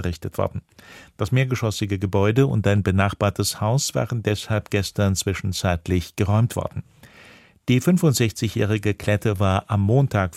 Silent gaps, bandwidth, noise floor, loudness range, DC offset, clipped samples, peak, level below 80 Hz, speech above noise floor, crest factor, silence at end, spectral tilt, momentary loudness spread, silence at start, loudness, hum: none; 15.5 kHz; -49 dBFS; 2 LU; under 0.1%; under 0.1%; -4 dBFS; -46 dBFS; 28 dB; 18 dB; 0 s; -5.5 dB/octave; 8 LU; 0 s; -22 LUFS; none